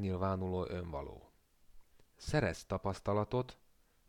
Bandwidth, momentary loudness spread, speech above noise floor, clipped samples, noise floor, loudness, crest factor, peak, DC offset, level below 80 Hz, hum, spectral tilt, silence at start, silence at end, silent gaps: 14 kHz; 13 LU; 28 dB; under 0.1%; -64 dBFS; -38 LUFS; 20 dB; -18 dBFS; under 0.1%; -56 dBFS; none; -6.5 dB/octave; 0 s; 0.55 s; none